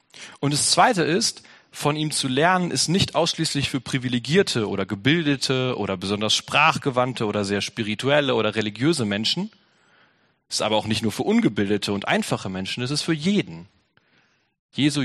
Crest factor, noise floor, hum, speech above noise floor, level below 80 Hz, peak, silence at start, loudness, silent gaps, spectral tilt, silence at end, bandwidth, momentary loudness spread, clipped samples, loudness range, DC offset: 20 dB; -63 dBFS; none; 41 dB; -58 dBFS; -4 dBFS; 0.15 s; -22 LUFS; 14.59-14.69 s; -4 dB/octave; 0 s; 13 kHz; 8 LU; under 0.1%; 3 LU; under 0.1%